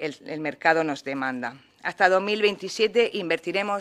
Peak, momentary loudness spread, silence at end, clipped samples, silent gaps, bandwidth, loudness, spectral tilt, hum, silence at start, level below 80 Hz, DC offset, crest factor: -4 dBFS; 12 LU; 0 s; under 0.1%; none; 13.5 kHz; -24 LUFS; -4 dB/octave; none; 0 s; -74 dBFS; under 0.1%; 22 dB